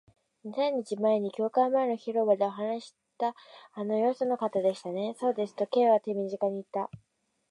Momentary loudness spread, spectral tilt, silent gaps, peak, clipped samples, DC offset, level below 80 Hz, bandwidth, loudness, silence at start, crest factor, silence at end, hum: 10 LU; -6.5 dB/octave; none; -12 dBFS; under 0.1%; under 0.1%; -78 dBFS; 11 kHz; -29 LUFS; 0.45 s; 18 dB; 0.55 s; none